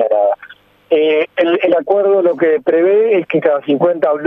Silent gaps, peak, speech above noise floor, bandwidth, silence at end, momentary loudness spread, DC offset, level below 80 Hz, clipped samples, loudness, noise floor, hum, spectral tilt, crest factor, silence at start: none; -2 dBFS; 28 dB; 4.1 kHz; 0 s; 3 LU; under 0.1%; -66 dBFS; under 0.1%; -13 LUFS; -40 dBFS; none; -8 dB/octave; 12 dB; 0 s